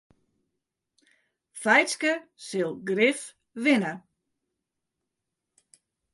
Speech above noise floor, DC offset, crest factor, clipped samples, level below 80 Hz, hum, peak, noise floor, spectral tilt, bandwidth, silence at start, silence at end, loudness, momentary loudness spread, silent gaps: 59 dB; under 0.1%; 22 dB; under 0.1%; -80 dBFS; none; -8 dBFS; -84 dBFS; -3.5 dB/octave; 11.5 kHz; 1.55 s; 2.15 s; -25 LUFS; 17 LU; none